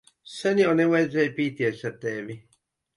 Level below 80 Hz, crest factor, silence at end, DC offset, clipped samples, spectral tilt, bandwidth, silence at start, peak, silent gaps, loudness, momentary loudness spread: -68 dBFS; 16 dB; 0.6 s; under 0.1%; under 0.1%; -6.5 dB/octave; 11.5 kHz; 0.25 s; -8 dBFS; none; -24 LUFS; 18 LU